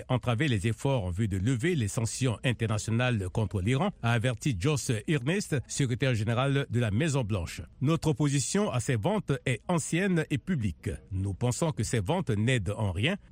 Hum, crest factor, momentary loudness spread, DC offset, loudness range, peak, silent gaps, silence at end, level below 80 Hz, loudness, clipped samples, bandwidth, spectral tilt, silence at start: none; 16 dB; 4 LU; under 0.1%; 1 LU; -12 dBFS; none; 0.15 s; -52 dBFS; -29 LUFS; under 0.1%; 16 kHz; -5.5 dB/octave; 0 s